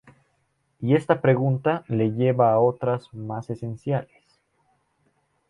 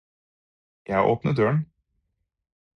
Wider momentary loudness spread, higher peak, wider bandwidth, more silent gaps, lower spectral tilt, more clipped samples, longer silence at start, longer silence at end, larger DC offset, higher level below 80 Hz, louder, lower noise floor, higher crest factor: first, 13 LU vs 6 LU; first, -4 dBFS vs -8 dBFS; first, 10 kHz vs 6.4 kHz; neither; about the same, -9.5 dB/octave vs -9 dB/octave; neither; about the same, 0.8 s vs 0.9 s; first, 1.45 s vs 1.1 s; neither; second, -62 dBFS vs -56 dBFS; about the same, -23 LUFS vs -23 LUFS; second, -70 dBFS vs -76 dBFS; about the same, 20 dB vs 20 dB